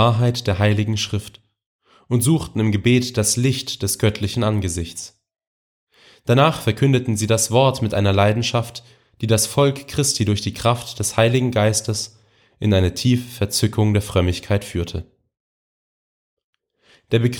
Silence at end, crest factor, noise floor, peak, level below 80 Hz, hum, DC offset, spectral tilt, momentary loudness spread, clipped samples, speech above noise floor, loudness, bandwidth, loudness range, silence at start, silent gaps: 0 s; 18 dB; -57 dBFS; -2 dBFS; -44 dBFS; none; under 0.1%; -5 dB/octave; 10 LU; under 0.1%; 39 dB; -19 LUFS; 19 kHz; 4 LU; 0 s; 1.66-1.79 s, 5.47-5.87 s, 15.40-16.37 s, 16.44-16.53 s